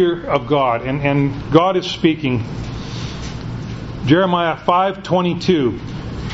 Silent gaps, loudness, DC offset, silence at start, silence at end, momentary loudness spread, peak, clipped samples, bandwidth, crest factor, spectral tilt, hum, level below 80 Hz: none; -18 LUFS; under 0.1%; 0 s; 0 s; 13 LU; 0 dBFS; under 0.1%; 8 kHz; 18 dB; -7 dB/octave; none; -38 dBFS